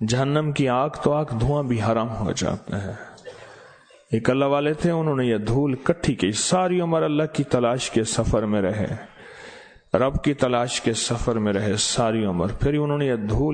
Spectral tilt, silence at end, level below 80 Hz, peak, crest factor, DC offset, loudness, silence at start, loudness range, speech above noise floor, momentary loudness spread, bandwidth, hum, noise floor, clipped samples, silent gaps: -5.5 dB/octave; 0 s; -40 dBFS; -2 dBFS; 20 dB; under 0.1%; -23 LUFS; 0 s; 3 LU; 28 dB; 9 LU; 9.4 kHz; none; -50 dBFS; under 0.1%; none